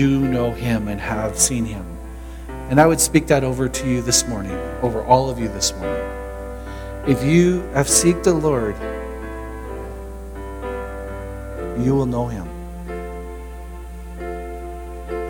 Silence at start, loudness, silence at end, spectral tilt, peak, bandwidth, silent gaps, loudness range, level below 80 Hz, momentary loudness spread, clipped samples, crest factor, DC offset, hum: 0 s; -20 LUFS; 0 s; -4.5 dB/octave; 0 dBFS; 19 kHz; none; 8 LU; -34 dBFS; 18 LU; under 0.1%; 20 dB; under 0.1%; none